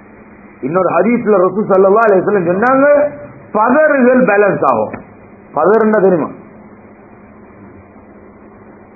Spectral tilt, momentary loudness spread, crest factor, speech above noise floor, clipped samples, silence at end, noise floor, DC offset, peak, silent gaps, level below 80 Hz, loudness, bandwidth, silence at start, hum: -11 dB/octave; 12 LU; 14 dB; 28 dB; under 0.1%; 2.6 s; -38 dBFS; under 0.1%; 0 dBFS; none; -52 dBFS; -11 LUFS; 2.7 kHz; 0.6 s; none